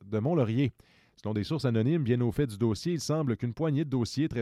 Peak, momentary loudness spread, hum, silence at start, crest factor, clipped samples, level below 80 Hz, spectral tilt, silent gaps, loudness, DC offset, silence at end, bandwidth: -14 dBFS; 5 LU; none; 0 s; 14 dB; under 0.1%; -56 dBFS; -7 dB/octave; none; -29 LUFS; under 0.1%; 0 s; 13.5 kHz